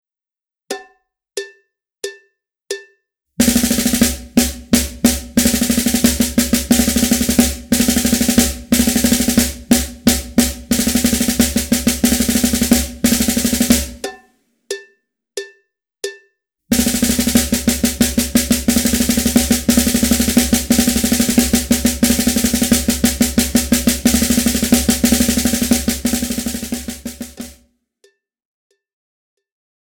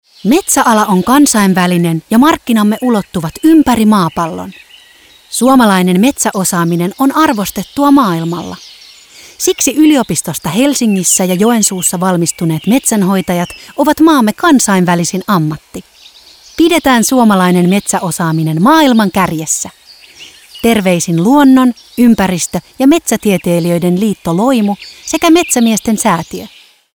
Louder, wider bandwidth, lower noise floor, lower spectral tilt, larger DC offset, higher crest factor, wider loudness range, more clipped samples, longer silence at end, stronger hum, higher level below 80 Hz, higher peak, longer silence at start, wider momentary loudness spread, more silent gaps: second, -15 LUFS vs -10 LUFS; about the same, over 20 kHz vs over 20 kHz; first, under -90 dBFS vs -42 dBFS; second, -3 dB/octave vs -4.5 dB/octave; neither; first, 16 dB vs 10 dB; first, 8 LU vs 2 LU; neither; first, 2.45 s vs 0.5 s; neither; first, -30 dBFS vs -44 dBFS; about the same, 0 dBFS vs 0 dBFS; first, 0.7 s vs 0.25 s; first, 15 LU vs 9 LU; neither